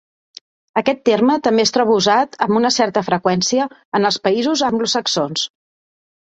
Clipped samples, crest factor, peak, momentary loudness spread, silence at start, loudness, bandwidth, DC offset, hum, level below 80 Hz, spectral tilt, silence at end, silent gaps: under 0.1%; 16 dB; -2 dBFS; 6 LU; 0.75 s; -17 LUFS; 8.2 kHz; under 0.1%; none; -60 dBFS; -3.5 dB/octave; 0.75 s; 3.85-3.92 s